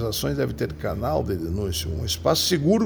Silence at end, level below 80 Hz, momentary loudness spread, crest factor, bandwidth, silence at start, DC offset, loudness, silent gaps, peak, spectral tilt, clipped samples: 0 s; -38 dBFS; 7 LU; 16 dB; over 20 kHz; 0 s; under 0.1%; -24 LUFS; none; -8 dBFS; -5 dB/octave; under 0.1%